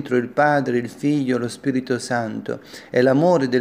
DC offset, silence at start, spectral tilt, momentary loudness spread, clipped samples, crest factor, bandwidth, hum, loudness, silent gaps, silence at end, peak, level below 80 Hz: under 0.1%; 0 s; -6.5 dB/octave; 10 LU; under 0.1%; 16 dB; 15.5 kHz; none; -20 LUFS; none; 0 s; -4 dBFS; -66 dBFS